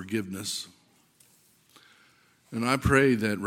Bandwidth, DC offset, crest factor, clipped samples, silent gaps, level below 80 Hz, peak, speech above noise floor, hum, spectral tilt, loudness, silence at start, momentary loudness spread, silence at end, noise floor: 16.5 kHz; under 0.1%; 24 dB; under 0.1%; none; -48 dBFS; -6 dBFS; 36 dB; none; -5 dB/octave; -26 LUFS; 0 s; 15 LU; 0 s; -62 dBFS